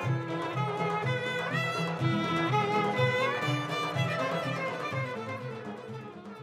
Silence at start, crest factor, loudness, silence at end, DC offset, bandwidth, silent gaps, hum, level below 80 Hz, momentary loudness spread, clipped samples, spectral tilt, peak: 0 s; 16 dB; -30 LUFS; 0 s; under 0.1%; 14.5 kHz; none; none; -70 dBFS; 12 LU; under 0.1%; -6 dB/octave; -14 dBFS